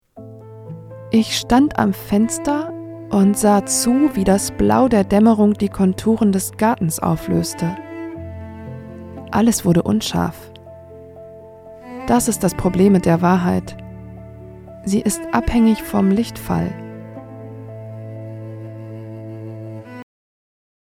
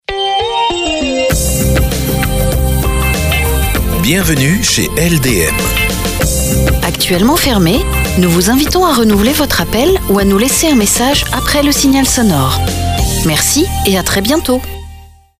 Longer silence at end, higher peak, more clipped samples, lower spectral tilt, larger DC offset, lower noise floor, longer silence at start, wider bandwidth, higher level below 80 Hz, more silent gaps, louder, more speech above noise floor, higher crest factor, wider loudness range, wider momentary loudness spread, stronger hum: first, 0.85 s vs 0.35 s; about the same, 0 dBFS vs 0 dBFS; neither; first, -5.5 dB/octave vs -4 dB/octave; neither; first, -39 dBFS vs -35 dBFS; about the same, 0.15 s vs 0.1 s; about the same, 16 kHz vs 16 kHz; second, -40 dBFS vs -20 dBFS; neither; second, -17 LUFS vs -11 LUFS; about the same, 23 dB vs 24 dB; first, 18 dB vs 12 dB; first, 9 LU vs 3 LU; first, 21 LU vs 5 LU; neither